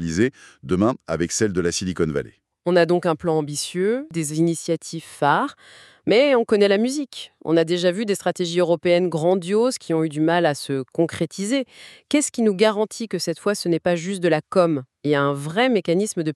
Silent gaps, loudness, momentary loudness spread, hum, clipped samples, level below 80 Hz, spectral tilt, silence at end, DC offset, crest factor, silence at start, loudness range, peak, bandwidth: none; -21 LUFS; 8 LU; none; under 0.1%; -58 dBFS; -5 dB/octave; 0 s; under 0.1%; 18 dB; 0 s; 2 LU; -4 dBFS; 13 kHz